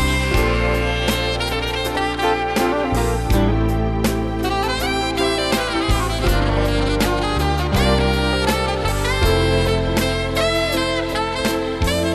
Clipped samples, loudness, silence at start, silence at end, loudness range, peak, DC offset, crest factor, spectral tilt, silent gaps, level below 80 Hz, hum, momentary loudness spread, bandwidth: under 0.1%; -19 LUFS; 0 s; 0 s; 1 LU; -6 dBFS; under 0.1%; 12 dB; -5 dB/octave; none; -24 dBFS; none; 3 LU; 13.5 kHz